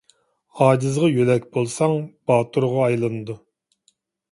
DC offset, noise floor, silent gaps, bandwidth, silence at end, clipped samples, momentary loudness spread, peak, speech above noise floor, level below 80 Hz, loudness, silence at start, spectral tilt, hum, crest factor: under 0.1%; -66 dBFS; none; 11.5 kHz; 0.95 s; under 0.1%; 9 LU; -2 dBFS; 46 dB; -62 dBFS; -20 LUFS; 0.55 s; -7 dB/octave; none; 20 dB